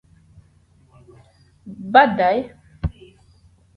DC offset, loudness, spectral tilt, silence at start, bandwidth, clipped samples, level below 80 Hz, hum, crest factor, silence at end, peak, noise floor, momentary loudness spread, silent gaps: under 0.1%; -18 LUFS; -7.5 dB/octave; 1.65 s; 5.4 kHz; under 0.1%; -42 dBFS; none; 22 dB; 0.85 s; 0 dBFS; -55 dBFS; 22 LU; none